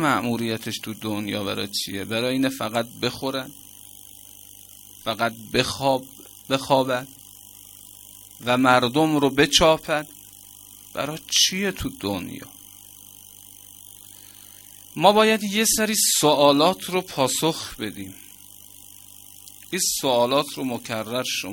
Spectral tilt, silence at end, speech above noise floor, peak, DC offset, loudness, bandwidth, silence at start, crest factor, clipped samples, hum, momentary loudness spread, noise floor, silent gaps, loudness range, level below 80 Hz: -3 dB/octave; 0 s; 24 dB; 0 dBFS; under 0.1%; -22 LUFS; 17 kHz; 0 s; 24 dB; under 0.1%; 50 Hz at -60 dBFS; 25 LU; -46 dBFS; none; 8 LU; -52 dBFS